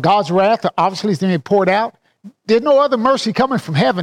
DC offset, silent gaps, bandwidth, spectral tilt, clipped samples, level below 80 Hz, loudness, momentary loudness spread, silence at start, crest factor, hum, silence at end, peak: under 0.1%; none; 12.5 kHz; -6 dB/octave; under 0.1%; -56 dBFS; -15 LUFS; 5 LU; 0 s; 12 dB; none; 0 s; -4 dBFS